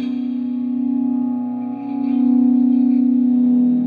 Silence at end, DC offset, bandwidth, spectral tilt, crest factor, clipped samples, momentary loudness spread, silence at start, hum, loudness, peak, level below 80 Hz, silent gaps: 0 s; under 0.1%; 3.9 kHz; -10 dB/octave; 10 dB; under 0.1%; 9 LU; 0 s; none; -18 LUFS; -8 dBFS; -76 dBFS; none